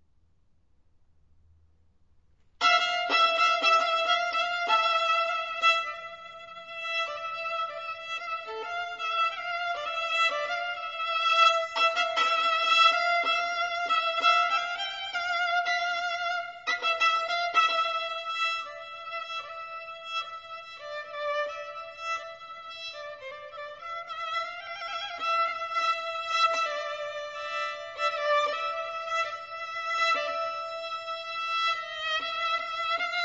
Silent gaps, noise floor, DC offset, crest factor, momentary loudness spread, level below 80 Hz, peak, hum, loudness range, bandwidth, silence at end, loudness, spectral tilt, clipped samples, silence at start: none; -68 dBFS; under 0.1%; 20 dB; 16 LU; -72 dBFS; -10 dBFS; none; 11 LU; 7.8 kHz; 0 s; -27 LUFS; 0.5 dB/octave; under 0.1%; 2.6 s